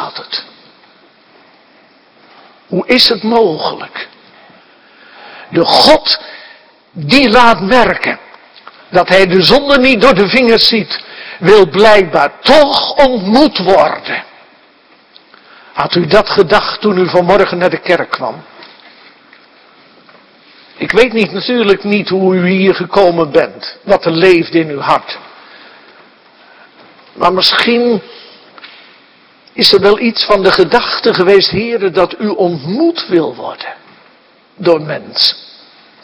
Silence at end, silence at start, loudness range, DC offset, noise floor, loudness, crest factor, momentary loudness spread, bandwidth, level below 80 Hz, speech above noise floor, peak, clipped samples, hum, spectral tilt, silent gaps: 0.6 s; 0 s; 7 LU; under 0.1%; -46 dBFS; -10 LUFS; 12 dB; 14 LU; 11 kHz; -42 dBFS; 37 dB; 0 dBFS; 1%; none; -5 dB/octave; none